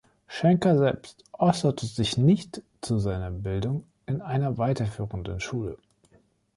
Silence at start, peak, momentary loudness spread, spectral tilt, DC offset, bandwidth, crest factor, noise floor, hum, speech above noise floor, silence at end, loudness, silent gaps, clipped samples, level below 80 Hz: 0.3 s; -6 dBFS; 15 LU; -7 dB/octave; under 0.1%; 11.5 kHz; 20 dB; -63 dBFS; none; 38 dB; 0.8 s; -26 LUFS; none; under 0.1%; -48 dBFS